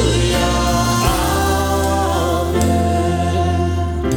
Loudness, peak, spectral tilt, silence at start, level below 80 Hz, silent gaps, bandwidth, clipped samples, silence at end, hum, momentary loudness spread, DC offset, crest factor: -17 LUFS; -2 dBFS; -5 dB/octave; 0 s; -24 dBFS; none; 19 kHz; under 0.1%; 0 s; none; 2 LU; under 0.1%; 14 dB